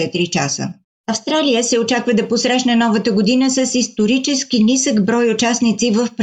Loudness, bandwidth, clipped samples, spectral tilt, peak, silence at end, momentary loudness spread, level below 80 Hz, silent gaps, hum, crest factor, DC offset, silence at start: -15 LUFS; 9.2 kHz; under 0.1%; -3.5 dB/octave; -4 dBFS; 0 s; 4 LU; -60 dBFS; 0.84-1.04 s; none; 12 dB; under 0.1%; 0 s